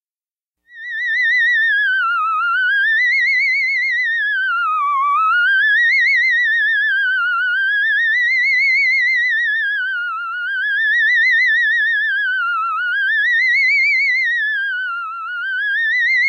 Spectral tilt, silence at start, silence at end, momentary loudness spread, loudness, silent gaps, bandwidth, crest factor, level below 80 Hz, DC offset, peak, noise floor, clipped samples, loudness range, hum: 6.5 dB/octave; 0.75 s; 0 s; 8 LU; -14 LUFS; none; 12 kHz; 8 dB; under -90 dBFS; under 0.1%; -8 dBFS; under -90 dBFS; under 0.1%; 2 LU; none